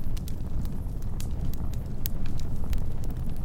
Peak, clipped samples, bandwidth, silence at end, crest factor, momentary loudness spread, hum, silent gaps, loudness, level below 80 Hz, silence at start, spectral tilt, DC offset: -6 dBFS; under 0.1%; 17 kHz; 0 s; 20 dB; 2 LU; none; none; -35 LUFS; -30 dBFS; 0 s; -6.5 dB/octave; under 0.1%